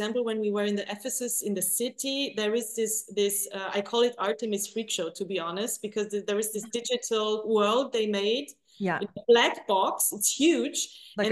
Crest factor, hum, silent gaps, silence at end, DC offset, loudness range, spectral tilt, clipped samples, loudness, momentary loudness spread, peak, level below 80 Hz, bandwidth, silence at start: 18 dB; none; none; 0 s; under 0.1%; 4 LU; -2.5 dB/octave; under 0.1%; -27 LUFS; 8 LU; -8 dBFS; -78 dBFS; 13 kHz; 0 s